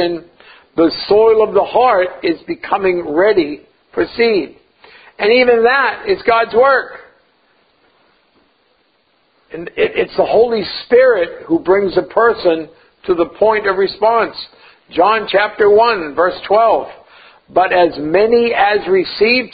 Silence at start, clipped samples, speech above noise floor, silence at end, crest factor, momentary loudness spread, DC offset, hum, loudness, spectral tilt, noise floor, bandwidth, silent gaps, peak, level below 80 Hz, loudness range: 0 s; under 0.1%; 46 dB; 0.05 s; 14 dB; 12 LU; under 0.1%; none; -13 LUFS; -9 dB/octave; -59 dBFS; 5 kHz; none; 0 dBFS; -50 dBFS; 5 LU